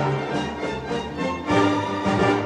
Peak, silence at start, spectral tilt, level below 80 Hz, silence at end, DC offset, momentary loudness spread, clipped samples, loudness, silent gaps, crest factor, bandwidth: -6 dBFS; 0 s; -6 dB/octave; -48 dBFS; 0 s; under 0.1%; 8 LU; under 0.1%; -24 LUFS; none; 16 dB; 10.5 kHz